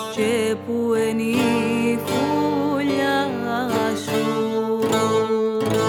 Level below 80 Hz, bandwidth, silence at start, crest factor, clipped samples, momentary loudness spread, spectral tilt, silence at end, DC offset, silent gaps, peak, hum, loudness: -62 dBFS; 19 kHz; 0 s; 14 dB; under 0.1%; 3 LU; -5 dB/octave; 0 s; under 0.1%; none; -6 dBFS; none; -21 LUFS